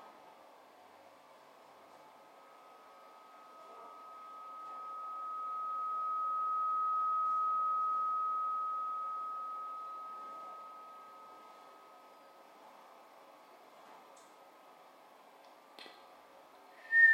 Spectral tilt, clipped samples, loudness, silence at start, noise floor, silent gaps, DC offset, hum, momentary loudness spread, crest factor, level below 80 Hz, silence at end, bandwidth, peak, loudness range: -1.5 dB/octave; under 0.1%; -36 LUFS; 0 s; -60 dBFS; none; under 0.1%; none; 26 LU; 22 dB; under -90 dBFS; 0 s; 15.5 kHz; -16 dBFS; 24 LU